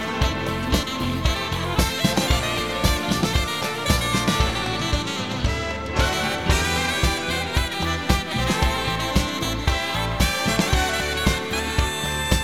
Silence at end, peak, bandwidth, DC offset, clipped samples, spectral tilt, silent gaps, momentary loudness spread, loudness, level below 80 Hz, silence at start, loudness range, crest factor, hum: 0 s; -2 dBFS; 17 kHz; 0.4%; under 0.1%; -4 dB/octave; none; 4 LU; -22 LUFS; -28 dBFS; 0 s; 1 LU; 20 dB; none